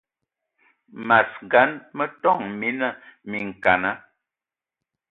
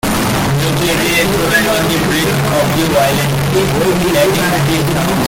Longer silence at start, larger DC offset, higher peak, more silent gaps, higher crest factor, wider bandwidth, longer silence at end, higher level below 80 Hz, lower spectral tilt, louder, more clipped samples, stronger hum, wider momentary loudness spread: first, 0.95 s vs 0.05 s; neither; about the same, -2 dBFS vs -2 dBFS; neither; first, 22 dB vs 12 dB; second, 4.7 kHz vs 17 kHz; first, 1.1 s vs 0 s; second, -62 dBFS vs -32 dBFS; first, -7.5 dB/octave vs -4.5 dB/octave; second, -22 LUFS vs -12 LUFS; neither; neither; first, 13 LU vs 2 LU